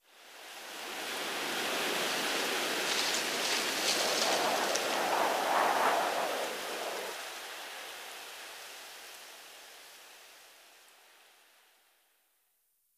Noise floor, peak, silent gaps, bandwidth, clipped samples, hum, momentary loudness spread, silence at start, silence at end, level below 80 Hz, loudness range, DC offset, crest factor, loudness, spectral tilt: -75 dBFS; -12 dBFS; none; 15.5 kHz; under 0.1%; none; 21 LU; 0.15 s; 2.25 s; -78 dBFS; 19 LU; under 0.1%; 22 dB; -31 LUFS; -0.5 dB/octave